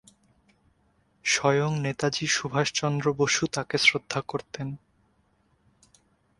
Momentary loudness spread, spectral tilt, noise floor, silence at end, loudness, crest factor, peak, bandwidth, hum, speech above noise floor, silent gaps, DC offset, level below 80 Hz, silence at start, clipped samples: 14 LU; -3.5 dB/octave; -67 dBFS; 1.6 s; -25 LUFS; 24 dB; -6 dBFS; 11.5 kHz; none; 41 dB; none; under 0.1%; -62 dBFS; 1.25 s; under 0.1%